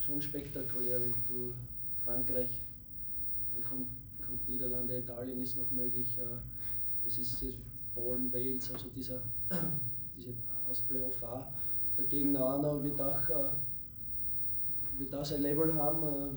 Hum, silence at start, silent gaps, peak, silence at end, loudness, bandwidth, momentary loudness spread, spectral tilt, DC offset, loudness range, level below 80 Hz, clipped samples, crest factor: none; 0 s; none; -20 dBFS; 0 s; -33 LUFS; over 20 kHz; 9 LU; -7 dB/octave; under 0.1%; 3 LU; -56 dBFS; under 0.1%; 16 dB